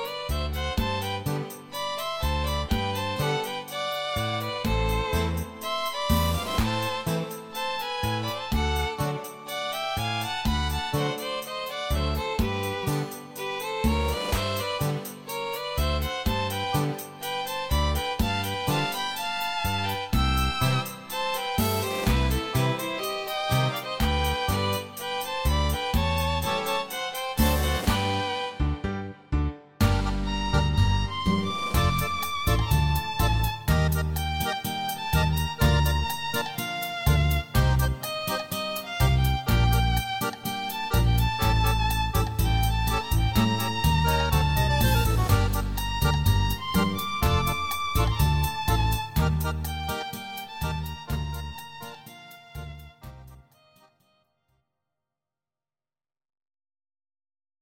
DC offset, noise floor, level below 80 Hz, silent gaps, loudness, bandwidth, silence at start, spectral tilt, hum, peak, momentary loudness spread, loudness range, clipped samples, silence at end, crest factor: under 0.1%; under -90 dBFS; -32 dBFS; none; -27 LUFS; 17 kHz; 0 s; -5 dB/octave; none; -8 dBFS; 8 LU; 5 LU; under 0.1%; 1.35 s; 18 dB